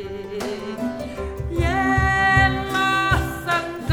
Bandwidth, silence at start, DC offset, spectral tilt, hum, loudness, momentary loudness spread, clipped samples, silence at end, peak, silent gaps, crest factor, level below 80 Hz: 18 kHz; 0 s; under 0.1%; -5.5 dB/octave; none; -21 LUFS; 13 LU; under 0.1%; 0 s; -4 dBFS; none; 18 dB; -32 dBFS